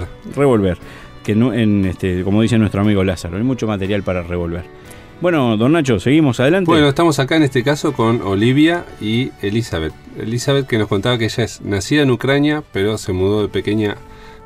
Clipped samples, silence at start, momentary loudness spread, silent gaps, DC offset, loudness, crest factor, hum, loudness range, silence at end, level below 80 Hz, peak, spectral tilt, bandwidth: under 0.1%; 0 s; 9 LU; none; under 0.1%; -16 LUFS; 14 dB; none; 4 LU; 0 s; -40 dBFS; -2 dBFS; -6 dB/octave; 15 kHz